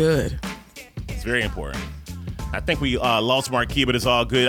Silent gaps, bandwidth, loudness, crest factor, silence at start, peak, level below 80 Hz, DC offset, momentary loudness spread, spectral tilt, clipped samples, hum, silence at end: none; 19 kHz; -22 LUFS; 18 dB; 0 s; -6 dBFS; -34 dBFS; under 0.1%; 15 LU; -4.5 dB/octave; under 0.1%; none; 0 s